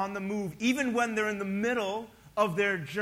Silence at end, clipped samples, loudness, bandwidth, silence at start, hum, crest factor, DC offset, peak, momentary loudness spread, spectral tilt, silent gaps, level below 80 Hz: 0 s; under 0.1%; -30 LUFS; 16 kHz; 0 s; none; 18 dB; under 0.1%; -12 dBFS; 7 LU; -5 dB/octave; none; -64 dBFS